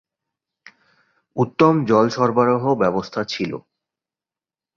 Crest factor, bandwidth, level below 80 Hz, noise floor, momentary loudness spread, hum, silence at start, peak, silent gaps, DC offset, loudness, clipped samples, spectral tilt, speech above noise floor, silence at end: 20 dB; 7.2 kHz; -60 dBFS; under -90 dBFS; 11 LU; none; 1.35 s; -2 dBFS; none; under 0.1%; -19 LUFS; under 0.1%; -7 dB/octave; over 72 dB; 1.15 s